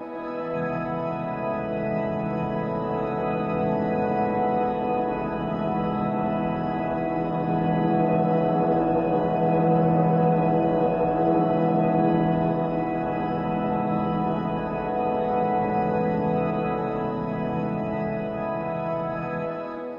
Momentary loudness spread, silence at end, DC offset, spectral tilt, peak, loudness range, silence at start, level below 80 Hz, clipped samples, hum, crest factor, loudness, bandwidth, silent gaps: 7 LU; 0 s; under 0.1%; -10.5 dB/octave; -10 dBFS; 5 LU; 0 s; -50 dBFS; under 0.1%; none; 16 dB; -25 LUFS; 5.2 kHz; none